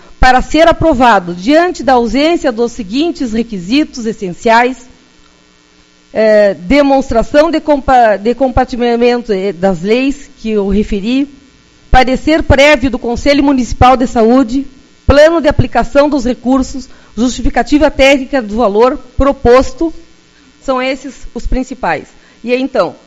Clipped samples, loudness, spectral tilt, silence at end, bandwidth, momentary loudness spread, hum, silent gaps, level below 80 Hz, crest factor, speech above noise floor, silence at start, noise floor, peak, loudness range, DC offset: 1%; -11 LUFS; -5.5 dB/octave; 0.15 s; 9.6 kHz; 11 LU; none; none; -24 dBFS; 10 dB; 36 dB; 0.2 s; -46 dBFS; 0 dBFS; 5 LU; under 0.1%